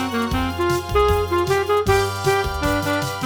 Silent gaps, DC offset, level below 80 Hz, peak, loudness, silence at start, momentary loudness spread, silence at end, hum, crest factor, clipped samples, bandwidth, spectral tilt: none; under 0.1%; -32 dBFS; -4 dBFS; -20 LUFS; 0 s; 4 LU; 0 s; none; 16 dB; under 0.1%; over 20 kHz; -5 dB/octave